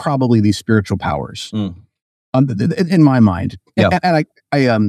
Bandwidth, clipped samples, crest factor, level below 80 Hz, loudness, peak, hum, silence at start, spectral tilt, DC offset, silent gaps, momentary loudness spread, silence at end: 13.5 kHz; under 0.1%; 14 dB; -44 dBFS; -16 LUFS; 0 dBFS; none; 0 s; -7 dB/octave; under 0.1%; 2.01-2.33 s; 11 LU; 0 s